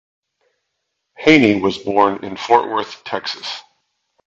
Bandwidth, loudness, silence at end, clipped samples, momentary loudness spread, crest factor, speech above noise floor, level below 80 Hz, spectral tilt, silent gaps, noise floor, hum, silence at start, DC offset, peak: 7.8 kHz; -16 LUFS; 0.7 s; under 0.1%; 15 LU; 18 dB; 58 dB; -56 dBFS; -5 dB/octave; none; -74 dBFS; none; 1.2 s; under 0.1%; 0 dBFS